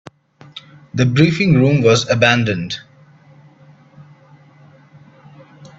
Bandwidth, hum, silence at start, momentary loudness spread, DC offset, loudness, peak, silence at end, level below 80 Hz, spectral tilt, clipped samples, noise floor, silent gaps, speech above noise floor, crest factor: 8 kHz; none; 0.55 s; 24 LU; under 0.1%; -14 LUFS; 0 dBFS; 0.1 s; -52 dBFS; -6 dB/octave; under 0.1%; -47 dBFS; none; 33 dB; 18 dB